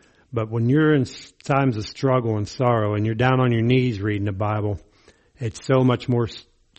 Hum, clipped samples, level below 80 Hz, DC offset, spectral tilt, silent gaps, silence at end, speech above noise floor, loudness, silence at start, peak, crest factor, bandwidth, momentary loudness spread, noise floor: none; under 0.1%; -52 dBFS; under 0.1%; -7.5 dB/octave; none; 0.4 s; 35 dB; -22 LUFS; 0.3 s; -4 dBFS; 18 dB; 8.4 kHz; 12 LU; -55 dBFS